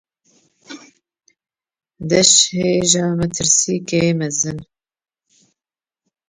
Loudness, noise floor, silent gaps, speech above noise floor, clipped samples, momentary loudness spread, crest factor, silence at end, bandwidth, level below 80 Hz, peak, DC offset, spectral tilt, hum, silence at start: -15 LUFS; under -90 dBFS; none; over 74 dB; under 0.1%; 10 LU; 20 dB; 1.65 s; 10.5 kHz; -52 dBFS; 0 dBFS; under 0.1%; -3 dB/octave; none; 0.7 s